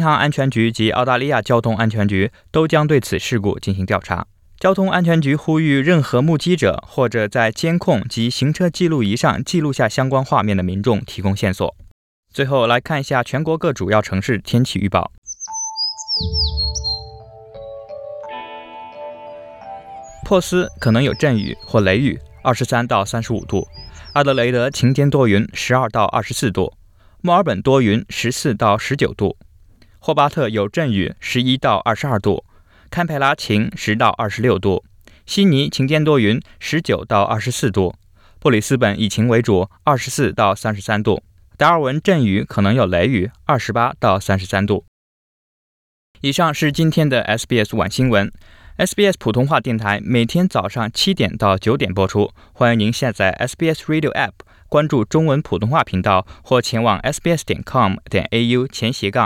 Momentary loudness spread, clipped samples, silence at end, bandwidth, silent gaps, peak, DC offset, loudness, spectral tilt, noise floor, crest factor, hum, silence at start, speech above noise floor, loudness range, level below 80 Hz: 8 LU; under 0.1%; 0 s; 16.5 kHz; 11.91-12.23 s, 15.18-15.22 s, 44.88-46.15 s; -2 dBFS; under 0.1%; -17 LUFS; -5.5 dB/octave; -47 dBFS; 16 dB; none; 0 s; 31 dB; 3 LU; -42 dBFS